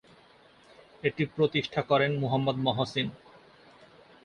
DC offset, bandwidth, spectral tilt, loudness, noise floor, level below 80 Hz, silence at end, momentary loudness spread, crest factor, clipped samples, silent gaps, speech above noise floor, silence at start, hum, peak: under 0.1%; 9.8 kHz; -6.5 dB/octave; -28 LUFS; -58 dBFS; -64 dBFS; 1.1 s; 7 LU; 20 dB; under 0.1%; none; 30 dB; 1.05 s; none; -12 dBFS